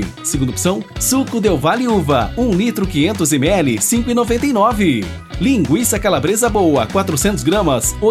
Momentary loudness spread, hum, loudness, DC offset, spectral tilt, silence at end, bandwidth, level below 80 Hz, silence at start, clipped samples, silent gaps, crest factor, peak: 4 LU; none; -15 LUFS; under 0.1%; -4.5 dB/octave; 0 s; 15.5 kHz; -32 dBFS; 0 s; under 0.1%; none; 14 dB; -2 dBFS